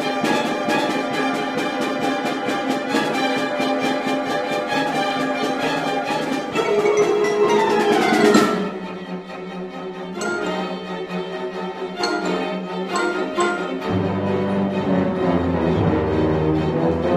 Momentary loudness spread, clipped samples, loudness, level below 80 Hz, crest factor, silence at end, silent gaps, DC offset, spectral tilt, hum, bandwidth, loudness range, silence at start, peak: 11 LU; under 0.1%; -21 LUFS; -46 dBFS; 18 dB; 0 s; none; under 0.1%; -5.5 dB/octave; none; 15.5 kHz; 7 LU; 0 s; -2 dBFS